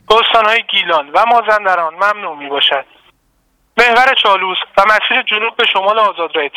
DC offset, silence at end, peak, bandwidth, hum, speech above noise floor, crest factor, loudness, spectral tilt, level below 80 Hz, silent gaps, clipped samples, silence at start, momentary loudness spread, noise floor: under 0.1%; 0.1 s; 0 dBFS; 16.5 kHz; none; 46 dB; 12 dB; -11 LUFS; -2 dB/octave; -50 dBFS; none; 0.2%; 0.1 s; 6 LU; -59 dBFS